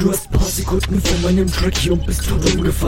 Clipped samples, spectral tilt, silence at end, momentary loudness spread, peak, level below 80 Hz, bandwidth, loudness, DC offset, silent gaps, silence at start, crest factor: under 0.1%; -5 dB/octave; 0 s; 3 LU; -2 dBFS; -22 dBFS; 17 kHz; -18 LUFS; under 0.1%; none; 0 s; 16 dB